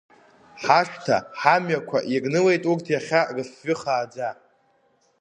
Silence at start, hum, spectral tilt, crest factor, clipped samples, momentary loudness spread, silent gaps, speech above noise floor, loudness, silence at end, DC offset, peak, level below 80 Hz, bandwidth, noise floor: 0.55 s; none; -5.5 dB/octave; 22 dB; under 0.1%; 10 LU; none; 42 dB; -23 LUFS; 0.85 s; under 0.1%; -2 dBFS; -70 dBFS; 10 kHz; -64 dBFS